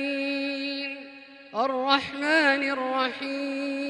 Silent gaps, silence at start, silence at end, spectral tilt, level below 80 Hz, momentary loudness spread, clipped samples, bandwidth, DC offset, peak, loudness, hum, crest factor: none; 0 s; 0 s; -3 dB/octave; -72 dBFS; 14 LU; under 0.1%; 11 kHz; under 0.1%; -6 dBFS; -26 LUFS; none; 20 dB